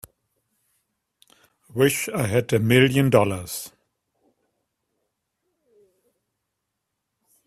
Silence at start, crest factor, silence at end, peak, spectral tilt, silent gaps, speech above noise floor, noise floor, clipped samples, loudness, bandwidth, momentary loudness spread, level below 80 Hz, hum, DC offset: 1.75 s; 24 dB; 3.8 s; -2 dBFS; -5.5 dB/octave; none; 60 dB; -80 dBFS; under 0.1%; -21 LUFS; 16 kHz; 16 LU; -58 dBFS; none; under 0.1%